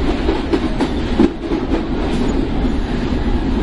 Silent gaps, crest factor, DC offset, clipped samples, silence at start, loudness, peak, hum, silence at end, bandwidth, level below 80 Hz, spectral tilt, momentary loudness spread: none; 16 dB; under 0.1%; under 0.1%; 0 s; -19 LUFS; 0 dBFS; none; 0 s; 11 kHz; -22 dBFS; -7 dB/octave; 4 LU